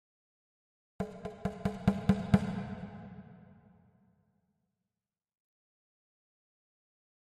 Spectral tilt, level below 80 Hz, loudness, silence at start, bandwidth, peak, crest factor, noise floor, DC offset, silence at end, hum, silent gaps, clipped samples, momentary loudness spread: -8 dB/octave; -56 dBFS; -34 LUFS; 1 s; 10.5 kHz; -10 dBFS; 28 dB; under -90 dBFS; under 0.1%; 3.85 s; none; none; under 0.1%; 20 LU